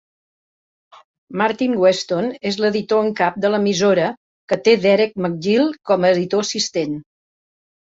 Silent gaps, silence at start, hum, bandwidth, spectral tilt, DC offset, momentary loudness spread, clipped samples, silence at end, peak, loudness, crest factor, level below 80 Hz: 4.17-4.48 s; 1.3 s; none; 8 kHz; -4.5 dB/octave; under 0.1%; 7 LU; under 0.1%; 0.95 s; -2 dBFS; -18 LUFS; 16 dB; -62 dBFS